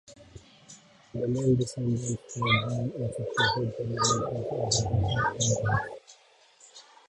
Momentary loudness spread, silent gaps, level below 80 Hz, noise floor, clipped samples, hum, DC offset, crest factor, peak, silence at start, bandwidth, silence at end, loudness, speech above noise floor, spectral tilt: 8 LU; none; -50 dBFS; -58 dBFS; under 0.1%; none; under 0.1%; 22 dB; -8 dBFS; 0.1 s; 11 kHz; 0.25 s; -28 LUFS; 30 dB; -4 dB/octave